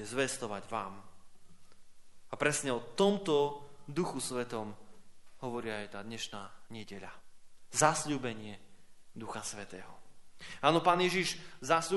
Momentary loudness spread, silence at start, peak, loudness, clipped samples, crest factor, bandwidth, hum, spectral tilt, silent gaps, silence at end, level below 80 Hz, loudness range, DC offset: 20 LU; 0 s; -10 dBFS; -33 LUFS; under 0.1%; 26 dB; 11.5 kHz; none; -3.5 dB/octave; none; 0 s; -64 dBFS; 6 LU; under 0.1%